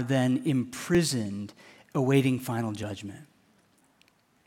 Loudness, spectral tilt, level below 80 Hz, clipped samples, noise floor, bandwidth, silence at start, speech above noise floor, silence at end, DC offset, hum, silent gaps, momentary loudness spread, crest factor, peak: -28 LUFS; -6 dB/octave; -62 dBFS; under 0.1%; -65 dBFS; 16.5 kHz; 0 s; 38 dB; 1.2 s; under 0.1%; none; none; 15 LU; 20 dB; -10 dBFS